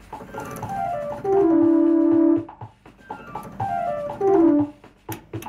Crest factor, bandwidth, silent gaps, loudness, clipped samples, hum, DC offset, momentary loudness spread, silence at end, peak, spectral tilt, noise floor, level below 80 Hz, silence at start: 12 dB; 14.5 kHz; none; -20 LUFS; under 0.1%; none; under 0.1%; 20 LU; 0 s; -10 dBFS; -8 dB/octave; -43 dBFS; -54 dBFS; 0.1 s